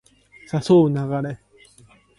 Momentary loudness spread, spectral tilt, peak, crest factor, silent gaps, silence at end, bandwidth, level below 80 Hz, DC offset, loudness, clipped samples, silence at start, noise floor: 15 LU; -8 dB/octave; -6 dBFS; 16 dB; none; 0.8 s; 11.5 kHz; -58 dBFS; under 0.1%; -20 LUFS; under 0.1%; 0.55 s; -53 dBFS